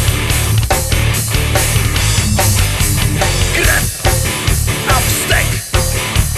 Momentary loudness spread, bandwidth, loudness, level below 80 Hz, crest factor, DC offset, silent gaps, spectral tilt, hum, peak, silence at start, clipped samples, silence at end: 3 LU; 13.5 kHz; -13 LUFS; -20 dBFS; 14 dB; under 0.1%; none; -3.5 dB/octave; none; 0 dBFS; 0 s; under 0.1%; 0 s